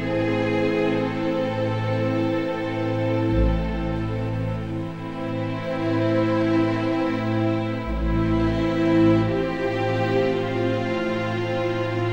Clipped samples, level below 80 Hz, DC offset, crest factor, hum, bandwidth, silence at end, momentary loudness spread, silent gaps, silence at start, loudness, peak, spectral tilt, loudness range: under 0.1%; -36 dBFS; 0.6%; 14 dB; none; 8.4 kHz; 0 s; 6 LU; none; 0 s; -23 LUFS; -8 dBFS; -8 dB/octave; 3 LU